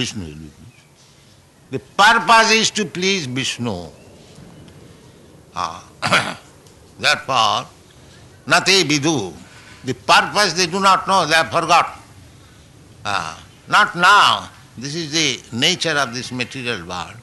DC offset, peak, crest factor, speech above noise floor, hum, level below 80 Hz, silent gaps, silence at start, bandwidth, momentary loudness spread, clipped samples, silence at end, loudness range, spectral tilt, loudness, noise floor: under 0.1%; -2 dBFS; 16 dB; 32 dB; none; -54 dBFS; none; 0 s; 12 kHz; 19 LU; under 0.1%; 0 s; 7 LU; -2.5 dB/octave; -16 LUFS; -49 dBFS